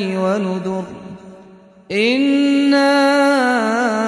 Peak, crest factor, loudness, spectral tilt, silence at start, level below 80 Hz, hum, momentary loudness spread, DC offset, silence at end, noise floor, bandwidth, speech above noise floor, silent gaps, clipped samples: -4 dBFS; 12 dB; -16 LUFS; -5 dB/octave; 0 s; -62 dBFS; none; 13 LU; under 0.1%; 0 s; -43 dBFS; 11 kHz; 28 dB; none; under 0.1%